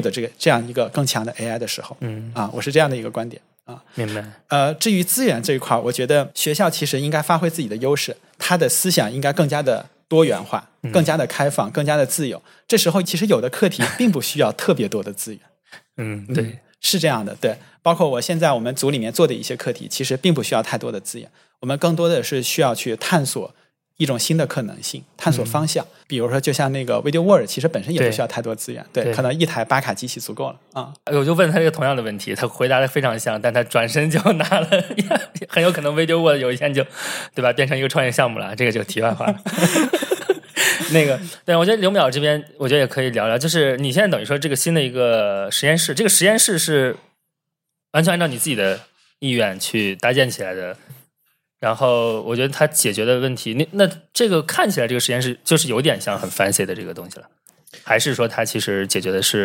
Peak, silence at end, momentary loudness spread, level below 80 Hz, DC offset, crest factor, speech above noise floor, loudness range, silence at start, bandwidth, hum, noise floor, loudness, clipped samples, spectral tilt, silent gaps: 0 dBFS; 0 s; 11 LU; -68 dBFS; under 0.1%; 18 dB; 61 dB; 4 LU; 0 s; 17 kHz; none; -81 dBFS; -19 LUFS; under 0.1%; -4 dB/octave; none